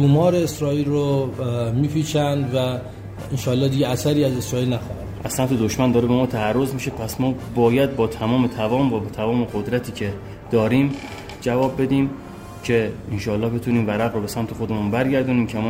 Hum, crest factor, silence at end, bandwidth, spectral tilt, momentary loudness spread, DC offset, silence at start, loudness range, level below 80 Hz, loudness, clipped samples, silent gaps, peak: none; 16 dB; 0 s; 16 kHz; -6.5 dB/octave; 9 LU; under 0.1%; 0 s; 2 LU; -44 dBFS; -21 LUFS; under 0.1%; none; -4 dBFS